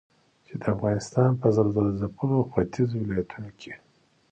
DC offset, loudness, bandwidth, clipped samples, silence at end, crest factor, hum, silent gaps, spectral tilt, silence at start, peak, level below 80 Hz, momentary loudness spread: under 0.1%; -25 LUFS; 8.8 kHz; under 0.1%; 0.55 s; 18 dB; none; none; -8.5 dB/octave; 0.5 s; -8 dBFS; -52 dBFS; 18 LU